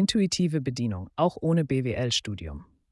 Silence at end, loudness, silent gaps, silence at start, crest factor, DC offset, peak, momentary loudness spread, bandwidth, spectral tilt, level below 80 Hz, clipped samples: 0.3 s; -27 LUFS; none; 0 s; 16 dB; under 0.1%; -10 dBFS; 13 LU; 12 kHz; -5.5 dB/octave; -52 dBFS; under 0.1%